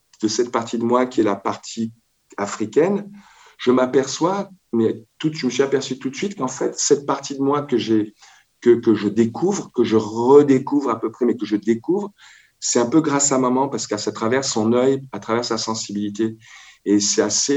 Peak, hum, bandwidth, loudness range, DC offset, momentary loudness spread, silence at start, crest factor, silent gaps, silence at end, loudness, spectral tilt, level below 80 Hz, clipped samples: 0 dBFS; none; 8.8 kHz; 4 LU; under 0.1%; 9 LU; 0.2 s; 20 dB; none; 0 s; -20 LUFS; -4 dB/octave; -66 dBFS; under 0.1%